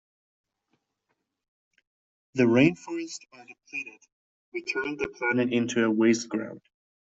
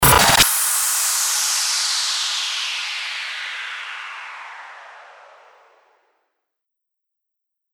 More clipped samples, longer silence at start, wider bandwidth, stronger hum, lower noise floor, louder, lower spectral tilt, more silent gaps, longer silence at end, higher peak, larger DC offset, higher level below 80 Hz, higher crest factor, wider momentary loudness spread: neither; first, 2.35 s vs 0 s; second, 8 kHz vs over 20 kHz; neither; about the same, -79 dBFS vs -80 dBFS; second, -26 LUFS vs -17 LUFS; first, -5.5 dB/octave vs -0.5 dB/octave; first, 4.12-4.52 s vs none; second, 0.5 s vs 2.6 s; second, -8 dBFS vs -2 dBFS; neither; second, -66 dBFS vs -42 dBFS; about the same, 22 dB vs 20 dB; second, 17 LU vs 21 LU